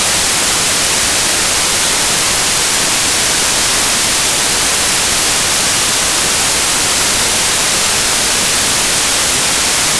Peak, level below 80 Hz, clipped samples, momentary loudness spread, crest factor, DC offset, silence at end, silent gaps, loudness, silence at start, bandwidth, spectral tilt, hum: -4 dBFS; -34 dBFS; under 0.1%; 0 LU; 10 dB; 0.4%; 0 s; none; -10 LUFS; 0 s; 11 kHz; 0 dB/octave; none